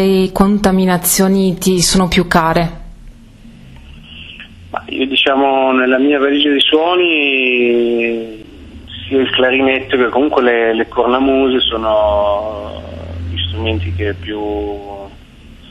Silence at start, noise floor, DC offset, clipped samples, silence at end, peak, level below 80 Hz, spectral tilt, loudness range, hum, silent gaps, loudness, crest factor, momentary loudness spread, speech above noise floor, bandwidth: 0 s; -38 dBFS; under 0.1%; under 0.1%; 0.05 s; 0 dBFS; -34 dBFS; -4 dB/octave; 6 LU; none; none; -13 LUFS; 14 dB; 16 LU; 25 dB; 13.5 kHz